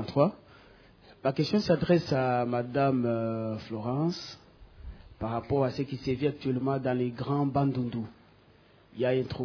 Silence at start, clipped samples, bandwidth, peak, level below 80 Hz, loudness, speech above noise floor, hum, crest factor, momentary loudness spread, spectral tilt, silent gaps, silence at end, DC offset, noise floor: 0 s; under 0.1%; 5.4 kHz; -10 dBFS; -56 dBFS; -29 LUFS; 31 dB; none; 20 dB; 12 LU; -8 dB/octave; none; 0 s; under 0.1%; -59 dBFS